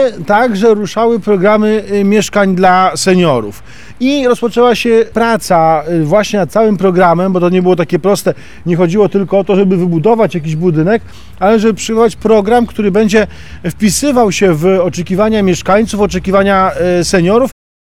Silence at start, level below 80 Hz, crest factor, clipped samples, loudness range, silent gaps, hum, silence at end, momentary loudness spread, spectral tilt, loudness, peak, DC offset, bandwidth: 0 s; -38 dBFS; 10 dB; under 0.1%; 1 LU; none; none; 0.4 s; 5 LU; -5.5 dB/octave; -11 LUFS; 0 dBFS; 3%; 15.5 kHz